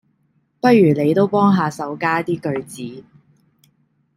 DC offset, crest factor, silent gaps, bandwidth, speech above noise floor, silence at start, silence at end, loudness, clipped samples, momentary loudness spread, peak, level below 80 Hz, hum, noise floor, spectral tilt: under 0.1%; 16 dB; none; 15.5 kHz; 47 dB; 0.65 s; 1.15 s; -17 LUFS; under 0.1%; 16 LU; -2 dBFS; -62 dBFS; none; -64 dBFS; -7.5 dB/octave